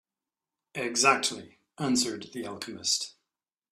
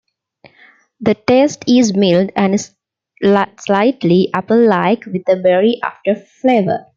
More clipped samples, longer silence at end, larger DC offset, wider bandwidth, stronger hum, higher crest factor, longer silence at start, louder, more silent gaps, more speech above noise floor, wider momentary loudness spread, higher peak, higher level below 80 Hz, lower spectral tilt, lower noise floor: neither; first, 0.65 s vs 0.15 s; neither; first, 14 kHz vs 7.6 kHz; neither; first, 24 dB vs 14 dB; second, 0.75 s vs 1 s; second, -28 LUFS vs -14 LUFS; neither; first, over 61 dB vs 35 dB; first, 16 LU vs 7 LU; second, -8 dBFS vs 0 dBFS; second, -72 dBFS vs -58 dBFS; second, -2 dB/octave vs -6 dB/octave; first, under -90 dBFS vs -49 dBFS